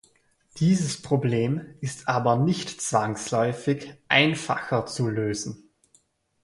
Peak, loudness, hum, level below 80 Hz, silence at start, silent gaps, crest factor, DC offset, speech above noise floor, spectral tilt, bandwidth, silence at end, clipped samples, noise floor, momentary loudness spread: -4 dBFS; -25 LUFS; none; -60 dBFS; 0.55 s; none; 22 dB; under 0.1%; 40 dB; -5 dB/octave; 11.5 kHz; 0.85 s; under 0.1%; -64 dBFS; 9 LU